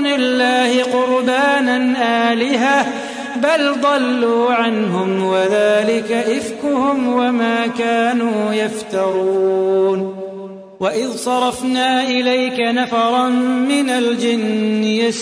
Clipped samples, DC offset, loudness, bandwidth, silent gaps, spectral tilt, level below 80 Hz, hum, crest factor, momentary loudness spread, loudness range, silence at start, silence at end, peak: under 0.1%; under 0.1%; -16 LUFS; 11 kHz; none; -4.5 dB/octave; -62 dBFS; none; 14 dB; 5 LU; 2 LU; 0 s; 0 s; -2 dBFS